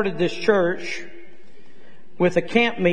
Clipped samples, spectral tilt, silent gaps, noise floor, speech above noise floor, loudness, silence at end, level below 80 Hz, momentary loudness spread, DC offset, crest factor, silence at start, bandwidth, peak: under 0.1%; -6 dB/octave; none; -52 dBFS; 32 dB; -21 LUFS; 0 s; -58 dBFS; 13 LU; 3%; 20 dB; 0 s; 9.8 kHz; -2 dBFS